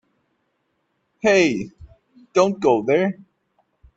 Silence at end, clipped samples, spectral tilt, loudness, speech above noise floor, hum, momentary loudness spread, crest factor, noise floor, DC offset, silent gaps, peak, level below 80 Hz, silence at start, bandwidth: 0.85 s; under 0.1%; -5 dB/octave; -19 LUFS; 53 dB; none; 13 LU; 20 dB; -71 dBFS; under 0.1%; none; -2 dBFS; -58 dBFS; 1.25 s; 8 kHz